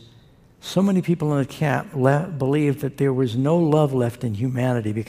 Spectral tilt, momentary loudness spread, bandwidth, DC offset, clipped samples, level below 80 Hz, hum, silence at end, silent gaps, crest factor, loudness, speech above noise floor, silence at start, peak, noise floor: -7.5 dB/octave; 6 LU; 15.5 kHz; under 0.1%; under 0.1%; -56 dBFS; none; 0 s; none; 18 dB; -21 LUFS; 31 dB; 0.65 s; -2 dBFS; -51 dBFS